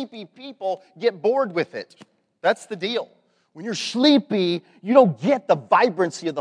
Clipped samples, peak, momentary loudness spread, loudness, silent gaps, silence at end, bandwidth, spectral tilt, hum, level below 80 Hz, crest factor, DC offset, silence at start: under 0.1%; 0 dBFS; 18 LU; -21 LUFS; none; 0 s; 10.5 kHz; -5 dB/octave; none; -82 dBFS; 22 dB; under 0.1%; 0 s